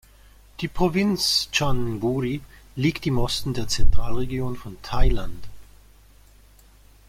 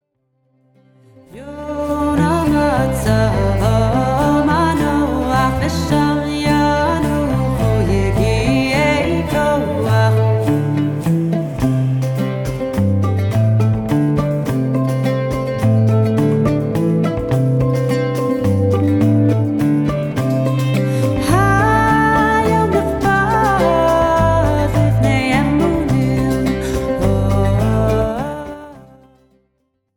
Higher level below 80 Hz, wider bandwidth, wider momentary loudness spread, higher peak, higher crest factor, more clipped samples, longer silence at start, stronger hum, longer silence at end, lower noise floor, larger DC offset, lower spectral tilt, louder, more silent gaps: about the same, -28 dBFS vs -30 dBFS; second, 15.5 kHz vs 18 kHz; first, 13 LU vs 5 LU; second, -4 dBFS vs 0 dBFS; about the same, 18 dB vs 14 dB; neither; second, 0.6 s vs 1.35 s; neither; first, 1.45 s vs 1.15 s; second, -52 dBFS vs -67 dBFS; neither; second, -4.5 dB/octave vs -7 dB/octave; second, -25 LUFS vs -16 LUFS; neither